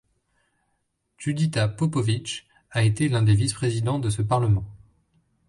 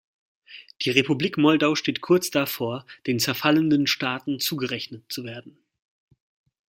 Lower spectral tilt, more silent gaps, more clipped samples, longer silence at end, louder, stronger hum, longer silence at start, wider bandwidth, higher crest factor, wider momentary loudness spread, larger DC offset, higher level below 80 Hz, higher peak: first, -6 dB/octave vs -4.5 dB/octave; neither; neither; second, 0.75 s vs 1.2 s; about the same, -24 LUFS vs -23 LUFS; neither; first, 1.2 s vs 0.5 s; second, 11.5 kHz vs 16.5 kHz; second, 16 dB vs 22 dB; second, 11 LU vs 14 LU; neither; first, -48 dBFS vs -68 dBFS; second, -8 dBFS vs -2 dBFS